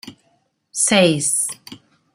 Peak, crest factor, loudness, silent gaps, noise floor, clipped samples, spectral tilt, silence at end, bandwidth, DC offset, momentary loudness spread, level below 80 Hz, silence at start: -2 dBFS; 20 dB; -16 LUFS; none; -64 dBFS; under 0.1%; -3 dB/octave; 0.4 s; 16 kHz; under 0.1%; 15 LU; -62 dBFS; 0.05 s